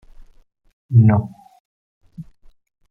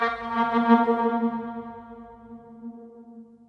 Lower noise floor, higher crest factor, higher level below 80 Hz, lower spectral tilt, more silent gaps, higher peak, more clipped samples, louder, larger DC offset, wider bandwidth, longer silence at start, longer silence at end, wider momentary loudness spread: second, -40 dBFS vs -47 dBFS; about the same, 18 dB vs 22 dB; first, -50 dBFS vs -62 dBFS; first, -12.5 dB/octave vs -7.5 dB/octave; first, 1.60-2.01 s vs none; about the same, -2 dBFS vs -4 dBFS; neither; first, -16 LUFS vs -23 LUFS; neither; second, 2.8 kHz vs 5.8 kHz; first, 0.9 s vs 0 s; first, 0.7 s vs 0.25 s; about the same, 27 LU vs 25 LU